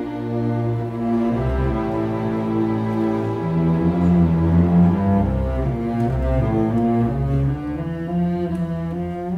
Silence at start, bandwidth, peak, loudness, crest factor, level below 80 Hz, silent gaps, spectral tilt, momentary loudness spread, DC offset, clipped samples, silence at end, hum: 0 s; 5 kHz; -4 dBFS; -20 LUFS; 14 dB; -30 dBFS; none; -10 dB/octave; 8 LU; under 0.1%; under 0.1%; 0 s; none